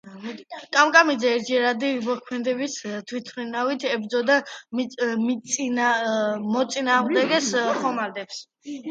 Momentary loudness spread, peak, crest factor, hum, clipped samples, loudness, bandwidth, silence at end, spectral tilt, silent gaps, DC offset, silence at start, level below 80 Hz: 14 LU; -2 dBFS; 22 dB; none; under 0.1%; -23 LUFS; 9.2 kHz; 0 s; -3 dB/octave; none; under 0.1%; 0.05 s; -76 dBFS